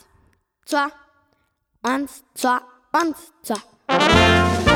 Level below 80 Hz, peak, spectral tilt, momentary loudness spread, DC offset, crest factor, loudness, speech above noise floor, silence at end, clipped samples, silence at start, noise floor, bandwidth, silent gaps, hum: -38 dBFS; 0 dBFS; -4.5 dB/octave; 15 LU; under 0.1%; 20 dB; -20 LUFS; 47 dB; 0 s; under 0.1%; 0.7 s; -68 dBFS; 18.5 kHz; none; none